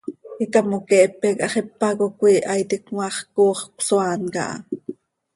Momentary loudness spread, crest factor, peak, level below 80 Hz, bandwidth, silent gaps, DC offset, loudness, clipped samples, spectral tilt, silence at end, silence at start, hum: 12 LU; 18 dB; -2 dBFS; -66 dBFS; 11.5 kHz; none; under 0.1%; -20 LUFS; under 0.1%; -4.5 dB/octave; 0.45 s; 0.05 s; none